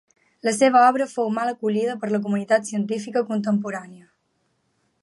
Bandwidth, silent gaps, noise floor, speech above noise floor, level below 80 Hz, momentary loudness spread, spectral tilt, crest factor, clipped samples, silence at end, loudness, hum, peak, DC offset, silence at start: 11.5 kHz; none; -70 dBFS; 49 dB; -76 dBFS; 10 LU; -5 dB/octave; 18 dB; under 0.1%; 1.05 s; -22 LUFS; none; -4 dBFS; under 0.1%; 0.45 s